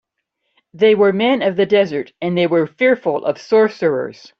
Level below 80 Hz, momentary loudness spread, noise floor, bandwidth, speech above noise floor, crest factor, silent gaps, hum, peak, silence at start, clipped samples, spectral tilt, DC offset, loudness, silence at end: -62 dBFS; 8 LU; -73 dBFS; 6.6 kHz; 57 dB; 14 dB; none; none; -2 dBFS; 0.75 s; under 0.1%; -7 dB/octave; under 0.1%; -16 LUFS; 0.3 s